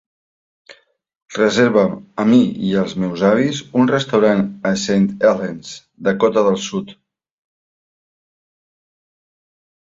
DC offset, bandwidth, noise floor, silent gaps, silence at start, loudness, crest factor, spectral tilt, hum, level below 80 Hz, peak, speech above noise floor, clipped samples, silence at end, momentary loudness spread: under 0.1%; 7.8 kHz; -56 dBFS; none; 1.3 s; -17 LUFS; 16 dB; -6 dB/octave; none; -56 dBFS; -2 dBFS; 40 dB; under 0.1%; 3.05 s; 12 LU